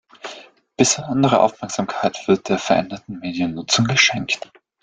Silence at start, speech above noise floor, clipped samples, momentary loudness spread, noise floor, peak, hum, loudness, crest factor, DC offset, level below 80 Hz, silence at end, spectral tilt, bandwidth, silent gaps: 0.25 s; 23 dB; under 0.1%; 15 LU; -42 dBFS; -2 dBFS; none; -19 LUFS; 20 dB; under 0.1%; -56 dBFS; 0.45 s; -3.5 dB/octave; 9.6 kHz; none